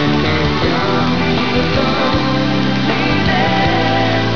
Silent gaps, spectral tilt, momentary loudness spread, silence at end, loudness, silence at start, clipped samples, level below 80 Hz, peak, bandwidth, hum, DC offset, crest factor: none; -6 dB/octave; 2 LU; 0 s; -14 LUFS; 0 s; under 0.1%; -32 dBFS; -2 dBFS; 5.4 kHz; none; 5%; 12 dB